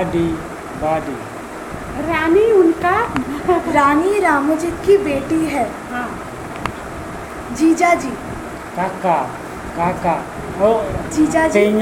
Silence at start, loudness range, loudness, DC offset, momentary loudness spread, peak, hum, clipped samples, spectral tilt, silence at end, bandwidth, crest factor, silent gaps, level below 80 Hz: 0 s; 5 LU; -17 LUFS; under 0.1%; 15 LU; 0 dBFS; none; under 0.1%; -5.5 dB/octave; 0 s; 16.5 kHz; 18 dB; none; -40 dBFS